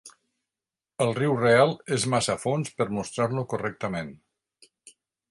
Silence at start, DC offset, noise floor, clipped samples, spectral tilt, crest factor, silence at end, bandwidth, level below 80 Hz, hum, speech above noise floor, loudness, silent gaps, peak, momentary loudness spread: 0.05 s; under 0.1%; under -90 dBFS; under 0.1%; -5 dB/octave; 22 dB; 1.15 s; 11.5 kHz; -62 dBFS; none; over 65 dB; -25 LUFS; none; -6 dBFS; 12 LU